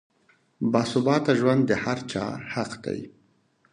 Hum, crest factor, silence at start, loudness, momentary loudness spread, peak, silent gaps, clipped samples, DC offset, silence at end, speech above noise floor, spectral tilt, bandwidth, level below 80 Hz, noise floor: none; 20 dB; 0.6 s; -25 LUFS; 12 LU; -6 dBFS; none; under 0.1%; under 0.1%; 0.65 s; 40 dB; -6 dB/octave; 11 kHz; -62 dBFS; -65 dBFS